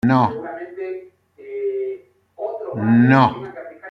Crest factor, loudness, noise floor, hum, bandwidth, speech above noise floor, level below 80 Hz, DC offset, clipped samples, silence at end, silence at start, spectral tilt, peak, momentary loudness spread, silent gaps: 18 dB; -19 LUFS; -43 dBFS; none; 6.2 kHz; 28 dB; -58 dBFS; under 0.1%; under 0.1%; 0 s; 0.05 s; -9 dB/octave; -2 dBFS; 20 LU; none